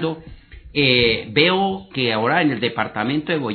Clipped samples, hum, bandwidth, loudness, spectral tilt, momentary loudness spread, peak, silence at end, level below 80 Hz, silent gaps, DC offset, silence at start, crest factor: under 0.1%; none; 4.6 kHz; -19 LUFS; -2.5 dB/octave; 8 LU; -2 dBFS; 0 s; -46 dBFS; none; under 0.1%; 0 s; 18 dB